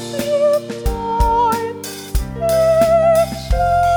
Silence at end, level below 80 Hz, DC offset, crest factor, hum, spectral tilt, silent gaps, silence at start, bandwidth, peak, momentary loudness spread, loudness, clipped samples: 0 s; -26 dBFS; under 0.1%; 14 dB; none; -5.5 dB/octave; none; 0 s; over 20 kHz; -2 dBFS; 11 LU; -16 LUFS; under 0.1%